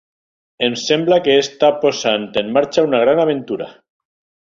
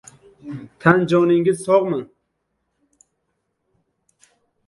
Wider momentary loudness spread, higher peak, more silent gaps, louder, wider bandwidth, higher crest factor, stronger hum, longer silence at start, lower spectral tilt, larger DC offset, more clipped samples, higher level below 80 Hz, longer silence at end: second, 8 LU vs 20 LU; about the same, -2 dBFS vs 0 dBFS; neither; about the same, -16 LUFS vs -17 LUFS; second, 7.6 kHz vs 11.5 kHz; second, 16 dB vs 22 dB; neither; first, 0.6 s vs 0.45 s; second, -4 dB/octave vs -7 dB/octave; neither; neither; about the same, -58 dBFS vs -60 dBFS; second, 0.7 s vs 2.65 s